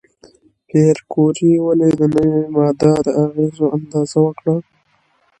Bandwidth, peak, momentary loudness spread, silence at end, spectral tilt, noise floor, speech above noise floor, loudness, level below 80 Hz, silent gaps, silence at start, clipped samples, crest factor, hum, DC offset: 10 kHz; 0 dBFS; 6 LU; 0.8 s; -8 dB/octave; -60 dBFS; 45 dB; -15 LUFS; -52 dBFS; none; 0.75 s; under 0.1%; 16 dB; none; under 0.1%